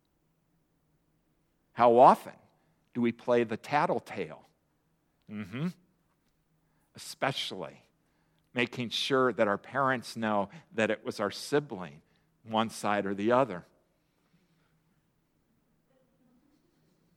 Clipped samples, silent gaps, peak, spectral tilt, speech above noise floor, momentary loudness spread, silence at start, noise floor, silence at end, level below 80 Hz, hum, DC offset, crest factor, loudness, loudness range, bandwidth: under 0.1%; none; -6 dBFS; -5 dB/octave; 45 dB; 17 LU; 1.75 s; -74 dBFS; 3.55 s; -78 dBFS; none; under 0.1%; 26 dB; -29 LUFS; 12 LU; 16.5 kHz